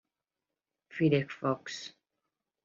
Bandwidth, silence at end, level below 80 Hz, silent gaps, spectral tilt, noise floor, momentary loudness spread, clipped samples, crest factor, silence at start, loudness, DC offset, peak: 7.6 kHz; 0.75 s; -74 dBFS; none; -6.5 dB/octave; -90 dBFS; 17 LU; under 0.1%; 22 dB; 0.9 s; -31 LUFS; under 0.1%; -14 dBFS